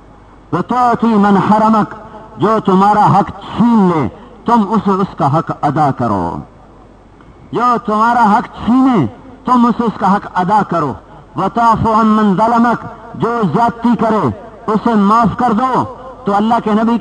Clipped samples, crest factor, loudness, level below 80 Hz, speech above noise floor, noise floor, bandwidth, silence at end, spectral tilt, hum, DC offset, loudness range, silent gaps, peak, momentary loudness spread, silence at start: under 0.1%; 12 dB; -13 LUFS; -42 dBFS; 28 dB; -40 dBFS; 9.2 kHz; 0 s; -8 dB/octave; none; under 0.1%; 3 LU; none; 0 dBFS; 11 LU; 0.5 s